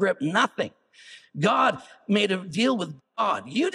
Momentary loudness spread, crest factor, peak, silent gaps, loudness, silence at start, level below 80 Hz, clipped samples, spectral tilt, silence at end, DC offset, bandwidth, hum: 11 LU; 18 dB; -8 dBFS; none; -25 LUFS; 0 s; -76 dBFS; under 0.1%; -5 dB/octave; 0.05 s; under 0.1%; 11.5 kHz; none